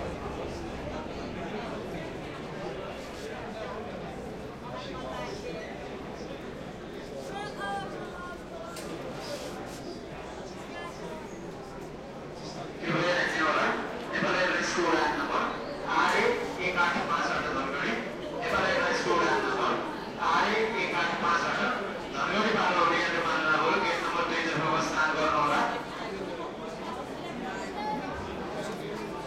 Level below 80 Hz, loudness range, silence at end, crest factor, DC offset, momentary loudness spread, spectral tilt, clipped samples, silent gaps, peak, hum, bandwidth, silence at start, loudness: -54 dBFS; 12 LU; 0 s; 20 dB; under 0.1%; 14 LU; -4 dB/octave; under 0.1%; none; -12 dBFS; none; 16 kHz; 0 s; -30 LUFS